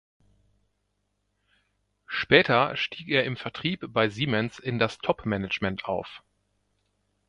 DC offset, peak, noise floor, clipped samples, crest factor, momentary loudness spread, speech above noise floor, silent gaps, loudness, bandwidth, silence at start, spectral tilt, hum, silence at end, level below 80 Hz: under 0.1%; -4 dBFS; -76 dBFS; under 0.1%; 26 dB; 11 LU; 50 dB; none; -26 LUFS; 10.5 kHz; 2.1 s; -6 dB/octave; 50 Hz at -60 dBFS; 1.1 s; -58 dBFS